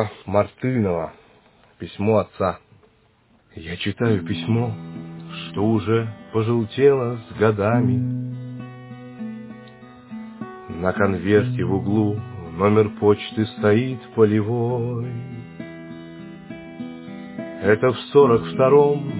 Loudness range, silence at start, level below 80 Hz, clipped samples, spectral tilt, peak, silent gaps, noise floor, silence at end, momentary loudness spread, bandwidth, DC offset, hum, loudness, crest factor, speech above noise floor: 6 LU; 0 s; -48 dBFS; under 0.1%; -11.5 dB/octave; -2 dBFS; none; -58 dBFS; 0 s; 20 LU; 4 kHz; under 0.1%; none; -20 LUFS; 18 dB; 38 dB